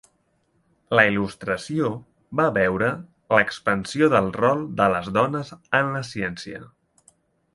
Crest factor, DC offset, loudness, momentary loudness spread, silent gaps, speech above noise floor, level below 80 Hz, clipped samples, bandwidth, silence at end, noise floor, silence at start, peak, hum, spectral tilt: 22 dB; under 0.1%; -22 LUFS; 11 LU; none; 45 dB; -54 dBFS; under 0.1%; 11.5 kHz; 0.9 s; -67 dBFS; 0.9 s; 0 dBFS; none; -6 dB/octave